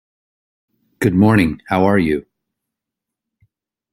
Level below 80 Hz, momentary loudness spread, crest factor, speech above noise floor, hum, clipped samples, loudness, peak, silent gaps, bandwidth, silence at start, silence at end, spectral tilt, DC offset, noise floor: -46 dBFS; 8 LU; 18 dB; 69 dB; none; under 0.1%; -16 LUFS; -2 dBFS; none; 15 kHz; 1 s; 1.7 s; -7.5 dB/octave; under 0.1%; -83 dBFS